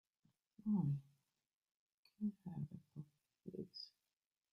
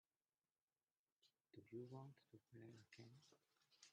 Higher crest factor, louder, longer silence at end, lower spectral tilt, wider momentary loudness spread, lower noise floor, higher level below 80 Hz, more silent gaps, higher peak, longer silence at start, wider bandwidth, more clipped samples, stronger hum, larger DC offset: about the same, 18 dB vs 20 dB; first, -46 LUFS vs -62 LUFS; first, 0.65 s vs 0 s; first, -9.5 dB/octave vs -6 dB/octave; first, 18 LU vs 10 LU; about the same, under -90 dBFS vs under -90 dBFS; first, -80 dBFS vs under -90 dBFS; first, 1.53-1.61 s, 1.74-1.87 s, 1.94-2.03 s vs none; first, -30 dBFS vs -44 dBFS; second, 0.65 s vs 1.2 s; second, 6 kHz vs 8.8 kHz; neither; neither; neither